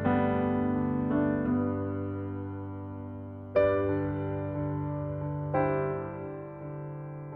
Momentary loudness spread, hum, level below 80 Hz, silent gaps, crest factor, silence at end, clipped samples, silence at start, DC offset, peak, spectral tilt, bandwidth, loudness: 13 LU; none; -54 dBFS; none; 18 dB; 0 s; under 0.1%; 0 s; under 0.1%; -12 dBFS; -11.5 dB/octave; 5 kHz; -31 LUFS